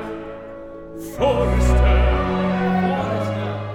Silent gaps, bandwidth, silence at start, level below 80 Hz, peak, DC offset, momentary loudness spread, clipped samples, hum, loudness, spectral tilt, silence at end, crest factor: none; 12.5 kHz; 0 s; -22 dBFS; -6 dBFS; under 0.1%; 18 LU; under 0.1%; none; -19 LUFS; -7 dB/octave; 0 s; 14 dB